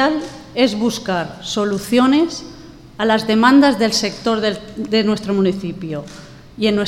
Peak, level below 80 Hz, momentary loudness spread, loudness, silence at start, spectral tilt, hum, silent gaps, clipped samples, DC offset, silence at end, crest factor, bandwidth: 0 dBFS; -48 dBFS; 15 LU; -17 LUFS; 0 s; -4.5 dB/octave; none; none; under 0.1%; under 0.1%; 0 s; 16 dB; 15.5 kHz